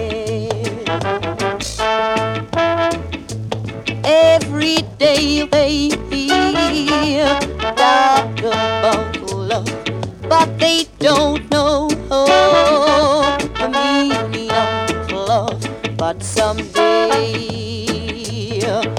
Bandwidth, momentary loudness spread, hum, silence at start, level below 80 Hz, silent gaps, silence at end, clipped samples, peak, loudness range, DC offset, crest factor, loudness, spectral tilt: 15.5 kHz; 11 LU; none; 0 s; -38 dBFS; none; 0 s; under 0.1%; 0 dBFS; 4 LU; under 0.1%; 16 dB; -16 LUFS; -4.5 dB/octave